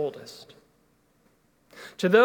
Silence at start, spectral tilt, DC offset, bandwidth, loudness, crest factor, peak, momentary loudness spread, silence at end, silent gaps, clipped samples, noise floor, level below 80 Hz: 0 s; -5.5 dB/octave; under 0.1%; 17.5 kHz; -27 LUFS; 22 dB; -4 dBFS; 26 LU; 0 s; none; under 0.1%; -65 dBFS; -74 dBFS